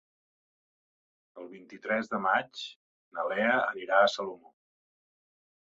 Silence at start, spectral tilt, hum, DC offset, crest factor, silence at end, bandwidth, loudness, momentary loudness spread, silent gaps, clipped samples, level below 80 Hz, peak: 1.35 s; -4 dB/octave; none; under 0.1%; 22 dB; 1.4 s; 7.8 kHz; -28 LUFS; 22 LU; 2.76-3.11 s; under 0.1%; -80 dBFS; -10 dBFS